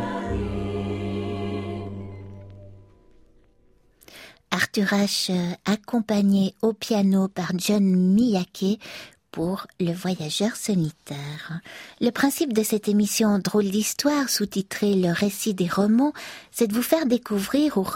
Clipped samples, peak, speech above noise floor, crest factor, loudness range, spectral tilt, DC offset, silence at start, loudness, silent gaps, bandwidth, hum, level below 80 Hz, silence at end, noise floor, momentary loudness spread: under 0.1%; -4 dBFS; 36 dB; 20 dB; 9 LU; -5 dB/octave; under 0.1%; 0 s; -24 LUFS; none; 16.5 kHz; none; -50 dBFS; 0 s; -59 dBFS; 14 LU